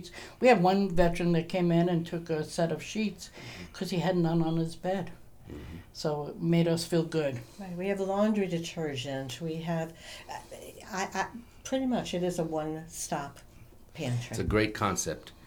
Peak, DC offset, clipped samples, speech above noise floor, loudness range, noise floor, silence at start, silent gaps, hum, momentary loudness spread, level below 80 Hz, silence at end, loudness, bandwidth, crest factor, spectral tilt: -10 dBFS; under 0.1%; under 0.1%; 22 dB; 5 LU; -52 dBFS; 0 s; none; none; 17 LU; -48 dBFS; 0 s; -30 LUFS; 19.5 kHz; 20 dB; -5.5 dB/octave